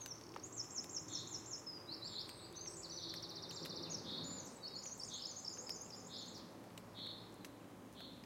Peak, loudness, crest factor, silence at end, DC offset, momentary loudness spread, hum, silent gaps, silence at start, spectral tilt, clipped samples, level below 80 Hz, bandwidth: -32 dBFS; -48 LUFS; 18 dB; 0 s; under 0.1%; 9 LU; none; none; 0 s; -2 dB/octave; under 0.1%; -78 dBFS; 16.5 kHz